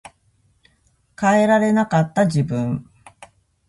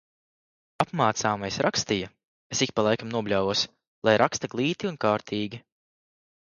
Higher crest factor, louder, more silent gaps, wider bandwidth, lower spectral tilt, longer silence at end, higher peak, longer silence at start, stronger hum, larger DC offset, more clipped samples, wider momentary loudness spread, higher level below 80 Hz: second, 16 dB vs 22 dB; first, -18 LUFS vs -26 LUFS; second, none vs 2.27-2.50 s, 3.87-4.02 s; about the same, 11.5 kHz vs 11 kHz; first, -7 dB/octave vs -4 dB/octave; second, 0.45 s vs 0.9 s; about the same, -4 dBFS vs -4 dBFS; first, 1.2 s vs 0.8 s; neither; neither; neither; about the same, 9 LU vs 9 LU; first, -54 dBFS vs -60 dBFS